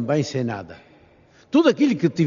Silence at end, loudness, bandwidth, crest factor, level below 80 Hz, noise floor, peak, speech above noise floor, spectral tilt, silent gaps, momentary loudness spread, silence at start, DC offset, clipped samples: 0 s; -20 LUFS; 7.4 kHz; 18 dB; -64 dBFS; -53 dBFS; -4 dBFS; 34 dB; -6 dB/octave; none; 14 LU; 0 s; under 0.1%; under 0.1%